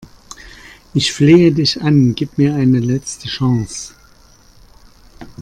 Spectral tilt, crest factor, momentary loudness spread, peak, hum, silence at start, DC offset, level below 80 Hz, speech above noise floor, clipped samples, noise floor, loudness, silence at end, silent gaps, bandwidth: -6 dB/octave; 16 dB; 21 LU; 0 dBFS; none; 0 s; under 0.1%; -44 dBFS; 33 dB; under 0.1%; -46 dBFS; -14 LUFS; 0 s; none; 12 kHz